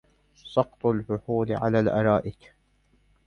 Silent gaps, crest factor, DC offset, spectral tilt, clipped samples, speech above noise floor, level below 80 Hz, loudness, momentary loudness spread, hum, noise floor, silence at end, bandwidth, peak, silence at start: none; 20 dB; under 0.1%; -9 dB/octave; under 0.1%; 40 dB; -54 dBFS; -25 LUFS; 6 LU; none; -65 dBFS; 0.95 s; 6.8 kHz; -6 dBFS; 0.45 s